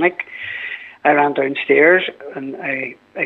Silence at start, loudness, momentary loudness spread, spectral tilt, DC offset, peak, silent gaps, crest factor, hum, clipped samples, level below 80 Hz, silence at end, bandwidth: 0 s; -17 LUFS; 16 LU; -7 dB/octave; under 0.1%; 0 dBFS; none; 18 dB; none; under 0.1%; -72 dBFS; 0 s; 4.2 kHz